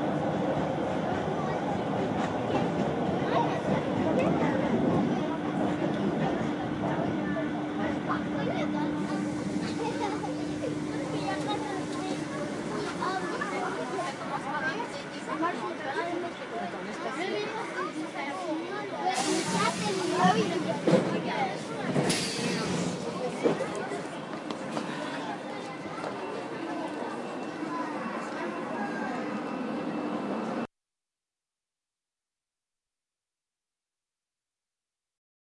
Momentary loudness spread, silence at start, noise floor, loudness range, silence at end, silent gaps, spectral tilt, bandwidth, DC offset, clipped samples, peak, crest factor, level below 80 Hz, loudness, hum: 8 LU; 0 s; under -90 dBFS; 7 LU; 4.85 s; none; -5.5 dB/octave; 11.5 kHz; under 0.1%; under 0.1%; -10 dBFS; 20 dB; -64 dBFS; -31 LUFS; none